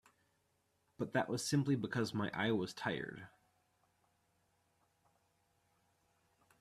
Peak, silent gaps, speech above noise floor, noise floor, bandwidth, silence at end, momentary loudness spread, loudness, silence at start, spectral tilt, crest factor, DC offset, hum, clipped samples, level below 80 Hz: -20 dBFS; none; 42 dB; -79 dBFS; 14.5 kHz; 3.35 s; 10 LU; -38 LUFS; 1 s; -5.5 dB/octave; 22 dB; under 0.1%; none; under 0.1%; -76 dBFS